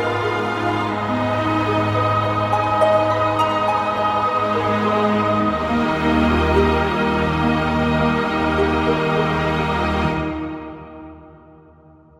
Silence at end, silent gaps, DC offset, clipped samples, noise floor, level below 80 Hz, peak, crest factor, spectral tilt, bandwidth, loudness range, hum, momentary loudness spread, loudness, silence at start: 0.85 s; none; under 0.1%; under 0.1%; -48 dBFS; -34 dBFS; -4 dBFS; 14 dB; -7 dB/octave; 15 kHz; 3 LU; none; 5 LU; -19 LUFS; 0 s